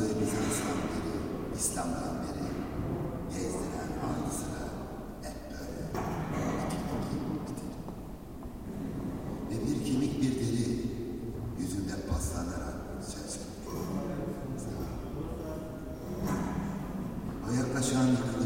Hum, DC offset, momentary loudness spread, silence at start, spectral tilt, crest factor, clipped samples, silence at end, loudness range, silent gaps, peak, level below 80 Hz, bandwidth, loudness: none; under 0.1%; 10 LU; 0 s; -5.5 dB/octave; 18 dB; under 0.1%; 0 s; 4 LU; none; -16 dBFS; -46 dBFS; 16.5 kHz; -35 LUFS